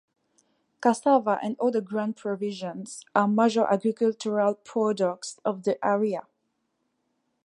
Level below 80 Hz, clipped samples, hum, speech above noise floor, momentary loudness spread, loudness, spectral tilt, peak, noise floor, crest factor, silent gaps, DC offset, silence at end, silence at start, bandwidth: -80 dBFS; under 0.1%; none; 51 dB; 9 LU; -26 LUFS; -5.5 dB/octave; -6 dBFS; -76 dBFS; 20 dB; none; under 0.1%; 1.25 s; 0.8 s; 11.5 kHz